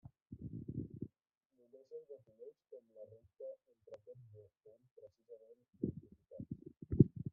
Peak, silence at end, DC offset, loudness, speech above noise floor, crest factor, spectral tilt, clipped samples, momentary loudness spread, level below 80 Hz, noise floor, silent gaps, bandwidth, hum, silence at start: -12 dBFS; 0 s; under 0.1%; -42 LUFS; 33 dB; 32 dB; -16 dB/octave; under 0.1%; 17 LU; -64 dBFS; -85 dBFS; 1.37-1.50 s, 4.91-4.96 s; 2 kHz; none; 0.3 s